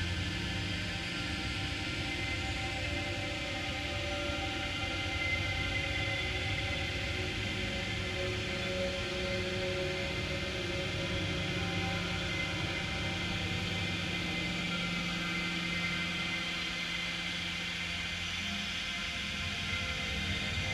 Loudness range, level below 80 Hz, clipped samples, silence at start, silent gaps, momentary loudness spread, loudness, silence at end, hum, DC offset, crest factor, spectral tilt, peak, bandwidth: 1 LU; -46 dBFS; under 0.1%; 0 s; none; 2 LU; -34 LUFS; 0 s; none; under 0.1%; 14 dB; -4 dB/octave; -20 dBFS; 13.5 kHz